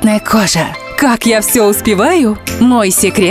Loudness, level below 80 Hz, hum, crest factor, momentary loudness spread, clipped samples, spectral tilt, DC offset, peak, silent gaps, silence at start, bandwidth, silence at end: -10 LUFS; -36 dBFS; none; 10 dB; 5 LU; under 0.1%; -4 dB/octave; under 0.1%; 0 dBFS; none; 0 s; 16 kHz; 0 s